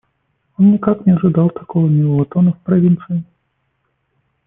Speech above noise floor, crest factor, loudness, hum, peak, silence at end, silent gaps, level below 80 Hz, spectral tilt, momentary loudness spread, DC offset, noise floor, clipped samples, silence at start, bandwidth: 54 dB; 14 dB; -14 LUFS; none; -2 dBFS; 1.25 s; none; -54 dBFS; -14.5 dB/octave; 6 LU; under 0.1%; -67 dBFS; under 0.1%; 0.6 s; 3.4 kHz